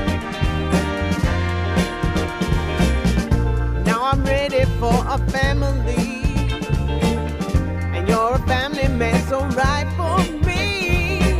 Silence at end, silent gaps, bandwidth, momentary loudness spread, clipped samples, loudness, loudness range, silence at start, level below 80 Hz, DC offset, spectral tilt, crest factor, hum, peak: 0 s; none; 15.5 kHz; 4 LU; under 0.1%; -20 LUFS; 1 LU; 0 s; -24 dBFS; under 0.1%; -6 dB/octave; 16 dB; none; -4 dBFS